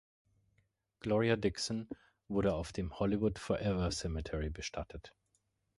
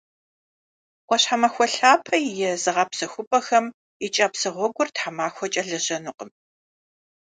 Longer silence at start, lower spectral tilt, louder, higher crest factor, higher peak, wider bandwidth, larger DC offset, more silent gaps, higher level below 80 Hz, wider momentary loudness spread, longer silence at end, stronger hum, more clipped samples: about the same, 1.05 s vs 1.1 s; first, -5.5 dB/octave vs -2 dB/octave; second, -36 LUFS vs -22 LUFS; about the same, 18 dB vs 22 dB; second, -18 dBFS vs -2 dBFS; first, 11.5 kHz vs 9.6 kHz; neither; second, none vs 3.27-3.31 s, 3.74-4.00 s; first, -50 dBFS vs -76 dBFS; about the same, 12 LU vs 12 LU; second, 0.7 s vs 0.95 s; neither; neither